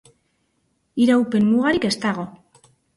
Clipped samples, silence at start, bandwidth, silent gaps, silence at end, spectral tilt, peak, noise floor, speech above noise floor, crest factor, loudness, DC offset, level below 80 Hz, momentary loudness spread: under 0.1%; 0.95 s; 11.5 kHz; none; 0.6 s; -5.5 dB/octave; -6 dBFS; -69 dBFS; 50 dB; 14 dB; -19 LUFS; under 0.1%; -58 dBFS; 13 LU